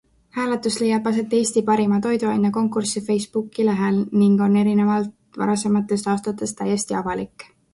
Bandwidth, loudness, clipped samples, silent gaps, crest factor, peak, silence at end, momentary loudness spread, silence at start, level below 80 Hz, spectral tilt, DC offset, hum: 11.5 kHz; -21 LUFS; under 0.1%; none; 14 dB; -6 dBFS; 0.3 s; 9 LU; 0.35 s; -58 dBFS; -5.5 dB/octave; under 0.1%; none